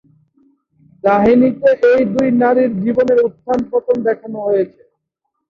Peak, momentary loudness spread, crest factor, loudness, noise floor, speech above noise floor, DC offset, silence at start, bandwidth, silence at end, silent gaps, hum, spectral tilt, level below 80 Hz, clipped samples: -2 dBFS; 8 LU; 14 dB; -14 LUFS; -74 dBFS; 60 dB; under 0.1%; 1.05 s; 6.8 kHz; 0.8 s; none; none; -8.5 dB/octave; -52 dBFS; under 0.1%